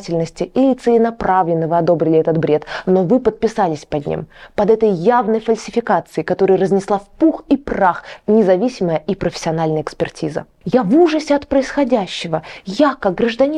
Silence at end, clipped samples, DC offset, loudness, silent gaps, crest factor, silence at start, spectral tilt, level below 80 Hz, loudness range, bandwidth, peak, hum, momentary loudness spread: 0 s; under 0.1%; under 0.1%; -16 LUFS; none; 14 dB; 0 s; -6.5 dB/octave; -46 dBFS; 2 LU; 10.5 kHz; -2 dBFS; none; 8 LU